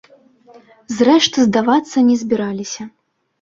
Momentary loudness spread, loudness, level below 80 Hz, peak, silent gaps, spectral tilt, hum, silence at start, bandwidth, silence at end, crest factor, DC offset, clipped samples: 16 LU; -15 LUFS; -58 dBFS; -2 dBFS; none; -4 dB/octave; none; 0.9 s; 7.6 kHz; 0.55 s; 16 dB; under 0.1%; under 0.1%